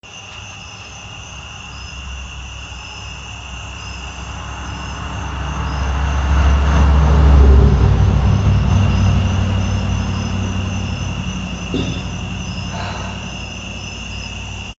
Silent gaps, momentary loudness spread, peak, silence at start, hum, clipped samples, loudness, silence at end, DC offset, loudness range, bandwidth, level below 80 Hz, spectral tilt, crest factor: none; 18 LU; 0 dBFS; 0.05 s; none; under 0.1%; -18 LUFS; 0.05 s; under 0.1%; 16 LU; 7.8 kHz; -20 dBFS; -6 dB/octave; 16 dB